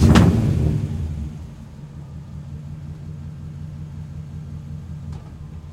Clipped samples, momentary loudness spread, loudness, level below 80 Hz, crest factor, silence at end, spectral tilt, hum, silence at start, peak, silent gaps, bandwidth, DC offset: under 0.1%; 18 LU; -24 LUFS; -34 dBFS; 22 dB; 0 s; -7 dB/octave; none; 0 s; 0 dBFS; none; 14.5 kHz; under 0.1%